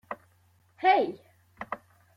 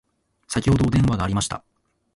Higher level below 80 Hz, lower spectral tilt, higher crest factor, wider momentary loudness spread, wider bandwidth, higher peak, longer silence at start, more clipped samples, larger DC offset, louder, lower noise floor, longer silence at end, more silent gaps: second, -74 dBFS vs -38 dBFS; about the same, -5.5 dB/octave vs -6 dB/octave; about the same, 20 dB vs 16 dB; first, 21 LU vs 10 LU; second, 6 kHz vs 11.5 kHz; second, -10 dBFS vs -6 dBFS; second, 0.1 s vs 0.5 s; neither; neither; second, -27 LUFS vs -21 LUFS; first, -64 dBFS vs -40 dBFS; second, 0.4 s vs 0.55 s; neither